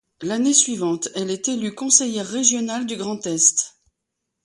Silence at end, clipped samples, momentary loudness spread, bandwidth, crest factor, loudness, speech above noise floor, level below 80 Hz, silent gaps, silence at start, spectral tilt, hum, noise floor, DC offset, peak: 0.75 s; under 0.1%; 10 LU; 11.5 kHz; 22 dB; -19 LUFS; 59 dB; -68 dBFS; none; 0.2 s; -2 dB/octave; none; -80 dBFS; under 0.1%; 0 dBFS